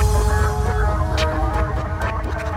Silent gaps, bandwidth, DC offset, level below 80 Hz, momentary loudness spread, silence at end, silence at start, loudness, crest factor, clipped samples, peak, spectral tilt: none; 14.5 kHz; under 0.1%; -22 dBFS; 5 LU; 0 s; 0 s; -21 LUFS; 12 dB; under 0.1%; -6 dBFS; -5.5 dB/octave